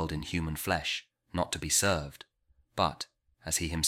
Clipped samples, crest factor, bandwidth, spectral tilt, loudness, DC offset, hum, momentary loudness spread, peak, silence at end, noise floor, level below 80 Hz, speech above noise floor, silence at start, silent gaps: under 0.1%; 22 dB; 16.5 kHz; -3 dB/octave; -31 LUFS; under 0.1%; none; 16 LU; -12 dBFS; 0 s; -55 dBFS; -48 dBFS; 23 dB; 0 s; none